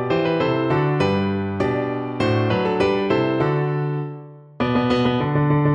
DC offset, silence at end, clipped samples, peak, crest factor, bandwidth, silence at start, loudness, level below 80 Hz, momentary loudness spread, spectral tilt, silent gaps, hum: under 0.1%; 0 s; under 0.1%; -6 dBFS; 14 dB; 8.4 kHz; 0 s; -21 LUFS; -48 dBFS; 6 LU; -8 dB/octave; none; none